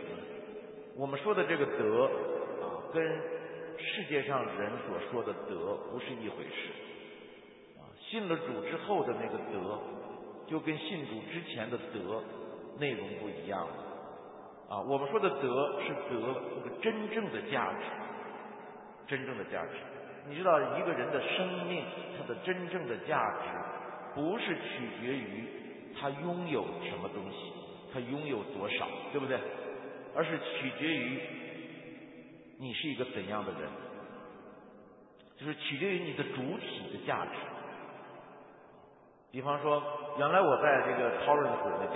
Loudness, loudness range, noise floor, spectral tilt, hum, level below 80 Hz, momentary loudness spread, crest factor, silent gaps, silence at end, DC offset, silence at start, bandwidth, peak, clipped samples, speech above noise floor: -35 LUFS; 7 LU; -60 dBFS; -1.5 dB/octave; none; -74 dBFS; 17 LU; 22 dB; none; 0 s; under 0.1%; 0 s; 3.9 kHz; -14 dBFS; under 0.1%; 25 dB